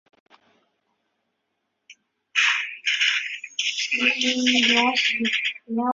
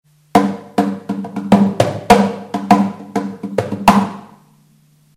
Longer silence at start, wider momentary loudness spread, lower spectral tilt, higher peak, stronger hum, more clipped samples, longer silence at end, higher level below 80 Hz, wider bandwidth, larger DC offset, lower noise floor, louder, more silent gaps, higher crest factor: first, 1.9 s vs 0.35 s; second, 8 LU vs 12 LU; second, -0.5 dB/octave vs -6.5 dB/octave; second, -4 dBFS vs 0 dBFS; neither; second, under 0.1% vs 0.6%; second, 0 s vs 0.9 s; second, -74 dBFS vs -46 dBFS; second, 7.8 kHz vs 15 kHz; neither; first, -77 dBFS vs -52 dBFS; second, -21 LUFS vs -16 LUFS; neither; first, 22 dB vs 16 dB